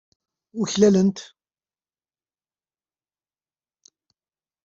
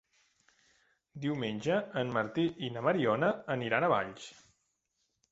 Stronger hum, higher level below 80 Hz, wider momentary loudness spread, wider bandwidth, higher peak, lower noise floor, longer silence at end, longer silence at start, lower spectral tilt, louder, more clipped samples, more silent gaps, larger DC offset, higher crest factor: neither; first, -64 dBFS vs -70 dBFS; first, 21 LU vs 12 LU; about the same, 7.8 kHz vs 8 kHz; first, -4 dBFS vs -14 dBFS; first, under -90 dBFS vs -81 dBFS; first, 3.4 s vs 1 s; second, 0.55 s vs 1.15 s; about the same, -6 dB/octave vs -6.5 dB/octave; first, -20 LUFS vs -32 LUFS; neither; neither; neither; about the same, 22 dB vs 20 dB